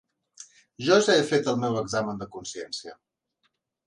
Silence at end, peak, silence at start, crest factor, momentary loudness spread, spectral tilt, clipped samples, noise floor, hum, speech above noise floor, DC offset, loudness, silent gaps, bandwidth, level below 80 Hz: 0.95 s; -6 dBFS; 0.4 s; 20 dB; 17 LU; -4 dB/octave; under 0.1%; -75 dBFS; none; 50 dB; under 0.1%; -25 LUFS; none; 11 kHz; -66 dBFS